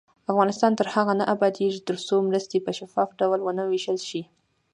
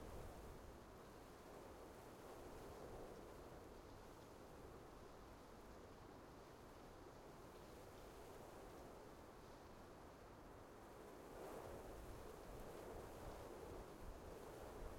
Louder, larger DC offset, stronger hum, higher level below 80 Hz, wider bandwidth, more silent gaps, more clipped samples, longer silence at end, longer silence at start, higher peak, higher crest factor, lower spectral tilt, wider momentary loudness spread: first, -24 LUFS vs -59 LUFS; neither; neither; second, -74 dBFS vs -64 dBFS; second, 10.5 kHz vs 16.5 kHz; neither; neither; first, 0.5 s vs 0 s; first, 0.3 s vs 0 s; first, -6 dBFS vs -42 dBFS; about the same, 18 dB vs 16 dB; about the same, -5.5 dB/octave vs -5.5 dB/octave; about the same, 7 LU vs 5 LU